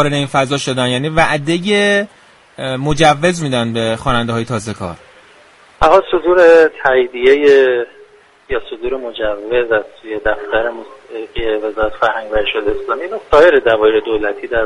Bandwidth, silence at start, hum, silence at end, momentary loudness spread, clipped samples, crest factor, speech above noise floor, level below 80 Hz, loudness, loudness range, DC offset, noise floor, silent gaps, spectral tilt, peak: 11.5 kHz; 0 s; none; 0 s; 13 LU; under 0.1%; 14 dB; 31 dB; -36 dBFS; -14 LUFS; 7 LU; under 0.1%; -45 dBFS; none; -5 dB/octave; 0 dBFS